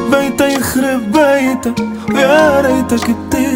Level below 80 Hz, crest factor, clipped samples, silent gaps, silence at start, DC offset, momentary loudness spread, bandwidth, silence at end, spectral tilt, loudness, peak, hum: -40 dBFS; 12 dB; under 0.1%; none; 0 s; under 0.1%; 7 LU; 16.5 kHz; 0 s; -4.5 dB/octave; -12 LUFS; 0 dBFS; none